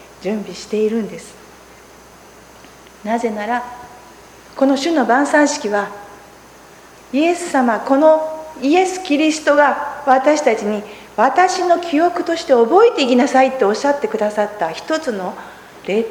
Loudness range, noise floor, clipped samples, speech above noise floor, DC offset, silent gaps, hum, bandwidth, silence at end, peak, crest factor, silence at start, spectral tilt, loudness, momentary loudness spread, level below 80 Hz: 10 LU; -42 dBFS; under 0.1%; 27 dB; under 0.1%; none; none; 19 kHz; 0 s; 0 dBFS; 16 dB; 0 s; -4 dB/octave; -16 LUFS; 14 LU; -56 dBFS